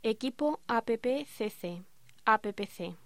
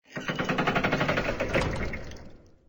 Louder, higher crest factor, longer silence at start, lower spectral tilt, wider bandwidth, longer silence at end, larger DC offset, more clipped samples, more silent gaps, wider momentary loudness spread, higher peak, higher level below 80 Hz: second, -33 LUFS vs -28 LUFS; first, 22 dB vs 16 dB; about the same, 0.05 s vs 0.1 s; about the same, -5 dB/octave vs -5.5 dB/octave; second, 16 kHz vs over 20 kHz; about the same, 0.1 s vs 0.2 s; first, 0.2% vs under 0.1%; neither; neither; about the same, 12 LU vs 13 LU; about the same, -12 dBFS vs -12 dBFS; second, -70 dBFS vs -42 dBFS